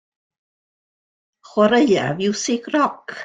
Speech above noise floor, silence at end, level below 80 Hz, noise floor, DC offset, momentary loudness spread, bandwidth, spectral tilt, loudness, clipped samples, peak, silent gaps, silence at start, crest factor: over 72 dB; 0 s; -62 dBFS; under -90 dBFS; under 0.1%; 7 LU; 9.4 kHz; -4.5 dB/octave; -19 LUFS; under 0.1%; -2 dBFS; none; 1.55 s; 18 dB